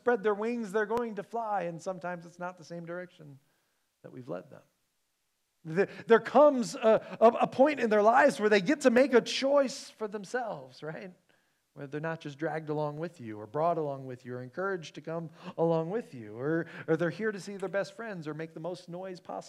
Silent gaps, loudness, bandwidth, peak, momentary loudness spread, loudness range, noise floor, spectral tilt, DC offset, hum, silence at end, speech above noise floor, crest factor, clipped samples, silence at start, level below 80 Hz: none; -29 LUFS; 13 kHz; -8 dBFS; 18 LU; 15 LU; -79 dBFS; -5.5 dB/octave; under 0.1%; none; 0 s; 49 dB; 22 dB; under 0.1%; 0.05 s; -78 dBFS